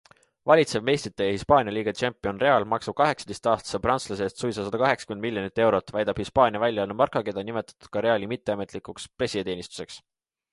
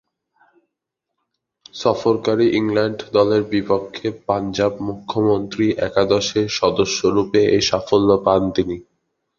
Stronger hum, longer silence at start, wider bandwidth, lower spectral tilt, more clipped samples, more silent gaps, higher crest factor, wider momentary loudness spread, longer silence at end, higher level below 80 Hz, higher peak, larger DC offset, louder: neither; second, 0.45 s vs 1.75 s; first, 11.5 kHz vs 7.4 kHz; about the same, -5 dB/octave vs -5 dB/octave; neither; neither; about the same, 22 dB vs 18 dB; first, 12 LU vs 7 LU; about the same, 0.55 s vs 0.55 s; second, -54 dBFS vs -48 dBFS; about the same, -4 dBFS vs -2 dBFS; neither; second, -25 LUFS vs -18 LUFS